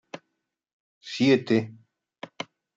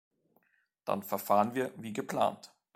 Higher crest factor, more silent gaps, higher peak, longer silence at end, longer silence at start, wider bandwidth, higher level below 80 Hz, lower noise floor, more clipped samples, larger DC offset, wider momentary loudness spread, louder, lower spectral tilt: about the same, 20 dB vs 22 dB; first, 0.73-1.01 s vs none; first, -8 dBFS vs -12 dBFS; about the same, 0.3 s vs 0.3 s; second, 0.15 s vs 0.85 s; second, 7.8 kHz vs 16 kHz; about the same, -76 dBFS vs -78 dBFS; first, -80 dBFS vs -73 dBFS; neither; neither; first, 23 LU vs 12 LU; first, -23 LUFS vs -32 LUFS; about the same, -6 dB/octave vs -5.5 dB/octave